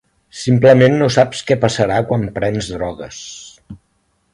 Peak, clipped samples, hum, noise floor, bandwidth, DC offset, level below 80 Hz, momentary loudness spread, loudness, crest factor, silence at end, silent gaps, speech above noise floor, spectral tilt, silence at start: 0 dBFS; under 0.1%; none; -63 dBFS; 11 kHz; under 0.1%; -44 dBFS; 21 LU; -15 LUFS; 16 dB; 0.55 s; none; 49 dB; -6 dB/octave; 0.35 s